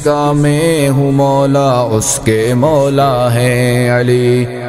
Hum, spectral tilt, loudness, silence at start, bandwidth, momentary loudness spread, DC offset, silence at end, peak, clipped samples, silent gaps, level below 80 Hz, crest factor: none; -5.5 dB/octave; -11 LUFS; 0 s; 16 kHz; 2 LU; under 0.1%; 0 s; 0 dBFS; under 0.1%; none; -38 dBFS; 10 dB